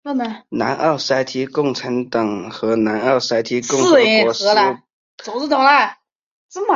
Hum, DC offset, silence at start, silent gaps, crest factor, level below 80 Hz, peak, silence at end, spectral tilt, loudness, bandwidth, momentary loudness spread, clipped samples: none; under 0.1%; 0.05 s; 4.93-5.18 s, 6.15-6.49 s; 16 dB; -62 dBFS; -2 dBFS; 0 s; -3.5 dB/octave; -17 LUFS; 7.8 kHz; 12 LU; under 0.1%